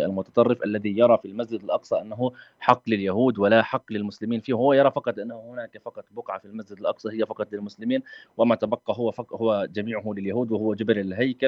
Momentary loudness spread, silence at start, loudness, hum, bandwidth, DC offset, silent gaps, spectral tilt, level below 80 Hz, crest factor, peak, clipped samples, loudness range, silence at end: 15 LU; 0 s; -24 LUFS; none; 7.2 kHz; under 0.1%; none; -8 dB/octave; -72 dBFS; 22 dB; -2 dBFS; under 0.1%; 6 LU; 0 s